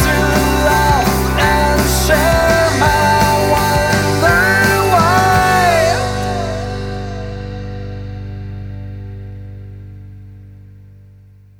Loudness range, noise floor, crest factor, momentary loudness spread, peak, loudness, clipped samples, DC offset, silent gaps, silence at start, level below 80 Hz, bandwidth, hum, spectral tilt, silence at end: 18 LU; -42 dBFS; 14 dB; 18 LU; 0 dBFS; -13 LUFS; under 0.1%; under 0.1%; none; 0 s; -26 dBFS; 19.5 kHz; 50 Hz at -30 dBFS; -4.5 dB/octave; 0.75 s